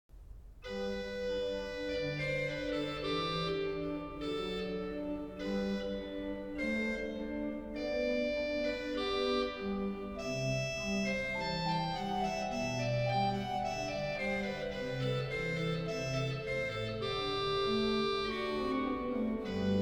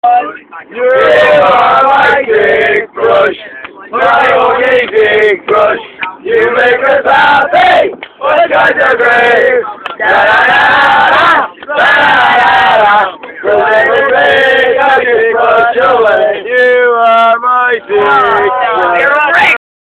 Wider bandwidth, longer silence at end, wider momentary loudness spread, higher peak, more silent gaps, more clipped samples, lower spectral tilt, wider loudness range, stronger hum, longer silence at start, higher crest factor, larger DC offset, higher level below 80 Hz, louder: first, 18.5 kHz vs 11 kHz; second, 0 s vs 0.35 s; about the same, 6 LU vs 8 LU; second, -20 dBFS vs 0 dBFS; neither; second, under 0.1% vs 0.9%; first, -5.5 dB/octave vs -4 dB/octave; about the same, 3 LU vs 2 LU; neither; about the same, 0.15 s vs 0.05 s; first, 16 dB vs 8 dB; neither; second, -54 dBFS vs -46 dBFS; second, -36 LUFS vs -7 LUFS